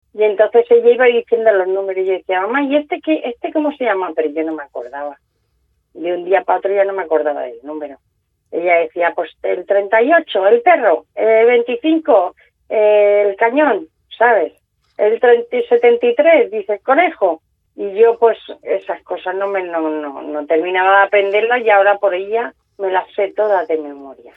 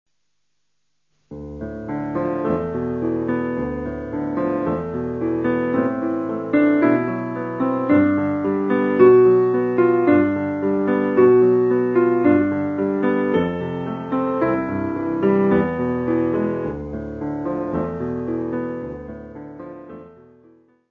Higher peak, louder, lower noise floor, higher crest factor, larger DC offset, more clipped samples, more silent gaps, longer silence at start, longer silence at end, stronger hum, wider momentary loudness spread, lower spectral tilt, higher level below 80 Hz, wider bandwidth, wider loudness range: about the same, 0 dBFS vs -2 dBFS; first, -15 LUFS vs -20 LUFS; second, -64 dBFS vs -76 dBFS; about the same, 14 dB vs 18 dB; neither; neither; neither; second, 0.15 s vs 1.3 s; second, 0.25 s vs 0.8 s; neither; about the same, 13 LU vs 14 LU; second, -6.5 dB/octave vs -10 dB/octave; second, -66 dBFS vs -48 dBFS; about the same, 4 kHz vs 4.2 kHz; second, 6 LU vs 10 LU